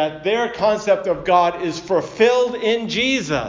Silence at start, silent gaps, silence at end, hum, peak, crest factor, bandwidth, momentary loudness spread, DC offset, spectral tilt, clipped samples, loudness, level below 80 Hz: 0 s; none; 0 s; none; -2 dBFS; 16 dB; 7.6 kHz; 5 LU; under 0.1%; -4 dB/octave; under 0.1%; -18 LUFS; -50 dBFS